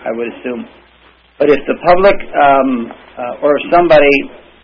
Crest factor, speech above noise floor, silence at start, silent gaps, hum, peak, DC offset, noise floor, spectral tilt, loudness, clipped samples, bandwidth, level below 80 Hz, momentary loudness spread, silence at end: 12 dB; 35 dB; 0 s; none; none; 0 dBFS; under 0.1%; -47 dBFS; -7 dB/octave; -11 LUFS; under 0.1%; 5.4 kHz; -36 dBFS; 17 LU; 0.25 s